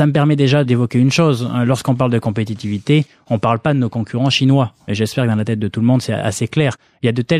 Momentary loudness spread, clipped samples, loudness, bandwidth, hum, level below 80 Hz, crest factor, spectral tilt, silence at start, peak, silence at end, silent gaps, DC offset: 7 LU; under 0.1%; -16 LUFS; 13.5 kHz; none; -52 dBFS; 14 dB; -6.5 dB/octave; 0 s; -2 dBFS; 0 s; none; under 0.1%